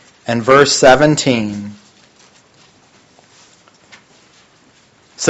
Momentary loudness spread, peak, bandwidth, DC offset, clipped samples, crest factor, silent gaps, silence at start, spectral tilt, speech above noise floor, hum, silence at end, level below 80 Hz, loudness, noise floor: 17 LU; 0 dBFS; 9.8 kHz; under 0.1%; 0.2%; 16 dB; none; 0.25 s; -4 dB/octave; 39 dB; none; 0 s; -48 dBFS; -11 LUFS; -50 dBFS